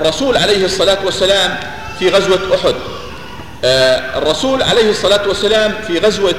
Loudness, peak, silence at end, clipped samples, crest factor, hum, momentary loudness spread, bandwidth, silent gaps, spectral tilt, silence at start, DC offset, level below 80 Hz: -13 LUFS; 0 dBFS; 0 s; under 0.1%; 14 dB; none; 12 LU; 16 kHz; none; -3.5 dB/octave; 0 s; 2%; -38 dBFS